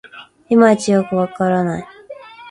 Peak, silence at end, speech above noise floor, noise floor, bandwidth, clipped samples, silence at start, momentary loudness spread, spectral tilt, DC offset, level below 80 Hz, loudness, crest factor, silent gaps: 0 dBFS; 0 s; 22 dB; -37 dBFS; 11 kHz; under 0.1%; 0.15 s; 24 LU; -6.5 dB/octave; under 0.1%; -56 dBFS; -15 LUFS; 16 dB; none